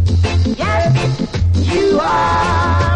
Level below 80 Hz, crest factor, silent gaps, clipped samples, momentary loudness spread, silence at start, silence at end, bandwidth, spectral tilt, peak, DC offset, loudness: -24 dBFS; 10 dB; none; under 0.1%; 2 LU; 0 s; 0 s; 9.4 kHz; -6.5 dB/octave; -4 dBFS; under 0.1%; -15 LUFS